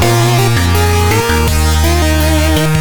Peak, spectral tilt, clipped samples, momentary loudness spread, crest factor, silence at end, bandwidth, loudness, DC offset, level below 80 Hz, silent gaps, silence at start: 0 dBFS; -5 dB/octave; under 0.1%; 1 LU; 10 dB; 0 s; over 20 kHz; -11 LUFS; under 0.1%; -16 dBFS; none; 0 s